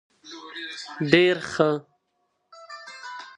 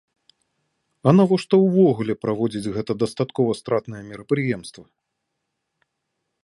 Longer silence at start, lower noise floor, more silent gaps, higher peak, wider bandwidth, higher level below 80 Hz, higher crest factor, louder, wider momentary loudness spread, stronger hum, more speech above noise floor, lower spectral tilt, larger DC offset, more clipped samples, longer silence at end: second, 0.25 s vs 1.05 s; second, -74 dBFS vs -78 dBFS; neither; about the same, -2 dBFS vs -2 dBFS; about the same, 10.5 kHz vs 11.5 kHz; about the same, -64 dBFS vs -60 dBFS; about the same, 24 dB vs 22 dB; about the same, -23 LUFS vs -21 LUFS; first, 23 LU vs 11 LU; neither; second, 52 dB vs 58 dB; second, -5.5 dB/octave vs -7.5 dB/octave; neither; neither; second, 0.05 s vs 1.6 s